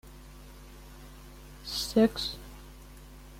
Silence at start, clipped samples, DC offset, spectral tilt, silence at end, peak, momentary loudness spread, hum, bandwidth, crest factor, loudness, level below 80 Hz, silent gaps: 0.05 s; under 0.1%; under 0.1%; -4.5 dB/octave; 0 s; -12 dBFS; 25 LU; 50 Hz at -50 dBFS; 16.5 kHz; 22 dB; -29 LUFS; -50 dBFS; none